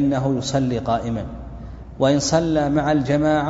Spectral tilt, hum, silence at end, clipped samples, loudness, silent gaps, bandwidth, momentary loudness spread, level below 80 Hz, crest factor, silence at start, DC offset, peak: -6 dB/octave; none; 0 s; under 0.1%; -20 LUFS; none; 8 kHz; 17 LU; -40 dBFS; 16 dB; 0 s; under 0.1%; -4 dBFS